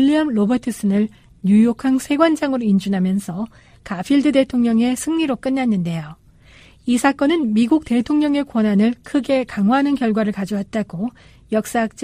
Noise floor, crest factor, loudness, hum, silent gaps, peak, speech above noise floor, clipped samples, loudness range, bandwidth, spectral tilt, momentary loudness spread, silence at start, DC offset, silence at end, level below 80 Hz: -47 dBFS; 16 dB; -18 LUFS; none; none; -2 dBFS; 29 dB; under 0.1%; 2 LU; 15.5 kHz; -6 dB/octave; 9 LU; 0 s; under 0.1%; 0 s; -50 dBFS